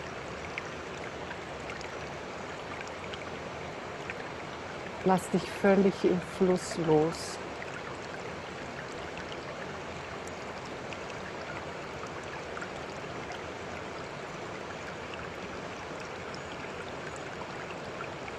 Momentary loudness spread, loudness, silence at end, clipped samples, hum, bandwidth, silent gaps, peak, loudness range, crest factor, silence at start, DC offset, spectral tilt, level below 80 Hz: 12 LU; -35 LUFS; 0 s; under 0.1%; none; 12.5 kHz; none; -12 dBFS; 11 LU; 22 dB; 0 s; under 0.1%; -5.5 dB/octave; -60 dBFS